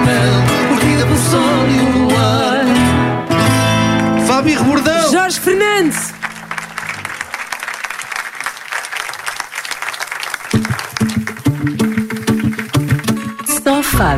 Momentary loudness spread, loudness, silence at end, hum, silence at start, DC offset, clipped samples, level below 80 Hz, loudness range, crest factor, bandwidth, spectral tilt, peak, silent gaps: 10 LU; -15 LUFS; 0 s; none; 0 s; under 0.1%; under 0.1%; -34 dBFS; 9 LU; 14 dB; 16 kHz; -5 dB/octave; -2 dBFS; none